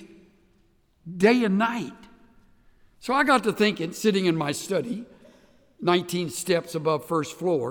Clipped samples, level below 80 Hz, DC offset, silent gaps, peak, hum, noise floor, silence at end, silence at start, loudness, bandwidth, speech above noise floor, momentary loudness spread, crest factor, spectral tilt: under 0.1%; -64 dBFS; under 0.1%; none; -6 dBFS; none; -63 dBFS; 0 s; 0 s; -24 LUFS; over 20 kHz; 39 dB; 12 LU; 20 dB; -5 dB/octave